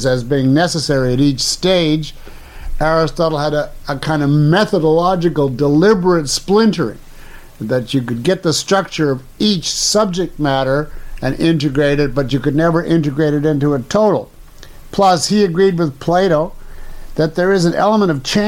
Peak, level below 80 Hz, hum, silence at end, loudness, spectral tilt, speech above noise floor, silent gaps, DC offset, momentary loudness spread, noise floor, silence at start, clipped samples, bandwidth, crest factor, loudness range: -2 dBFS; -32 dBFS; none; 0 s; -15 LUFS; -5 dB/octave; 21 dB; none; under 0.1%; 8 LU; -35 dBFS; 0 s; under 0.1%; 16.5 kHz; 12 dB; 2 LU